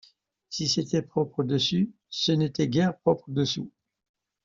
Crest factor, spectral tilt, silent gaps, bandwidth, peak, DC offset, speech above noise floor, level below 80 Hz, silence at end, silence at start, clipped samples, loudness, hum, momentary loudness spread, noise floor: 18 dB; -5.5 dB/octave; none; 7.6 kHz; -10 dBFS; under 0.1%; 31 dB; -62 dBFS; 0.75 s; 0.5 s; under 0.1%; -26 LUFS; none; 6 LU; -57 dBFS